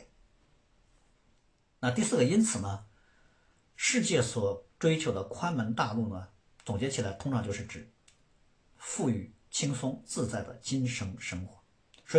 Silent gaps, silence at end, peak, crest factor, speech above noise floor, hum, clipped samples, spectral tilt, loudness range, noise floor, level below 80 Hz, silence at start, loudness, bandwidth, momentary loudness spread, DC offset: none; 0 s; -12 dBFS; 22 dB; 38 dB; none; under 0.1%; -4.5 dB/octave; 6 LU; -69 dBFS; -64 dBFS; 0 s; -32 LUFS; 10.5 kHz; 13 LU; under 0.1%